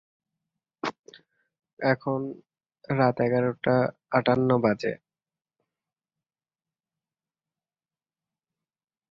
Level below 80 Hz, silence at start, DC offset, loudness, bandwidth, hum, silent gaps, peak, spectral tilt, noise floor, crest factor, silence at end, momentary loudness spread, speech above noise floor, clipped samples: -66 dBFS; 0.85 s; under 0.1%; -26 LUFS; 7.2 kHz; none; 0.99-1.04 s, 1.73-1.77 s; -8 dBFS; -8 dB/octave; under -90 dBFS; 20 dB; 4.15 s; 12 LU; over 66 dB; under 0.1%